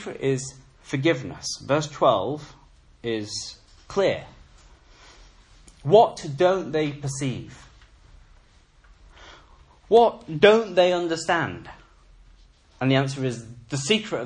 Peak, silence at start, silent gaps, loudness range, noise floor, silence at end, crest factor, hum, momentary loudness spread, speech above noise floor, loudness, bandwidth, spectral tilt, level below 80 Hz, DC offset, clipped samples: -2 dBFS; 0 s; none; 9 LU; -55 dBFS; 0 s; 22 dB; none; 15 LU; 33 dB; -23 LUFS; 11 kHz; -5 dB/octave; -54 dBFS; under 0.1%; under 0.1%